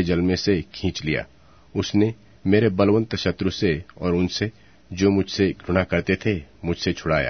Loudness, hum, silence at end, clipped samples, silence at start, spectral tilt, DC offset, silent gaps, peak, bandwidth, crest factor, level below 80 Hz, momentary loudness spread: -23 LUFS; none; 0 s; under 0.1%; 0 s; -6 dB/octave; 0.2%; none; -4 dBFS; 6.6 kHz; 18 dB; -44 dBFS; 9 LU